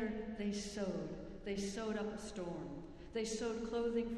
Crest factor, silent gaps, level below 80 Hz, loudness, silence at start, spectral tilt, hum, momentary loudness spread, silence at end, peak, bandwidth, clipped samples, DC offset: 14 dB; none; -58 dBFS; -42 LUFS; 0 s; -5 dB/octave; none; 8 LU; 0 s; -28 dBFS; 12.5 kHz; under 0.1%; under 0.1%